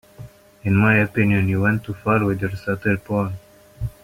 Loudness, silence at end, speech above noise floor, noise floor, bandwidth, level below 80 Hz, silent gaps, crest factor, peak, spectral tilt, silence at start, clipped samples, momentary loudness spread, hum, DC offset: -20 LUFS; 0.15 s; 23 dB; -42 dBFS; 15.5 kHz; -46 dBFS; none; 18 dB; -4 dBFS; -8.5 dB/octave; 0.2 s; under 0.1%; 13 LU; none; under 0.1%